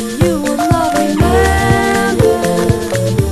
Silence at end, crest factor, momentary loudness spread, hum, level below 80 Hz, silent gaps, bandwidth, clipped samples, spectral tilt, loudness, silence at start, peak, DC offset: 0 s; 12 dB; 3 LU; none; -24 dBFS; none; 14.5 kHz; under 0.1%; -5.5 dB/octave; -13 LUFS; 0 s; 0 dBFS; under 0.1%